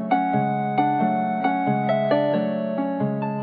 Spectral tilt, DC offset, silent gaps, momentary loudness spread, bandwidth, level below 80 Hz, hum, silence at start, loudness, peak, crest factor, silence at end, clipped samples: -11 dB/octave; under 0.1%; none; 4 LU; 4.9 kHz; -72 dBFS; none; 0 s; -22 LUFS; -8 dBFS; 14 dB; 0 s; under 0.1%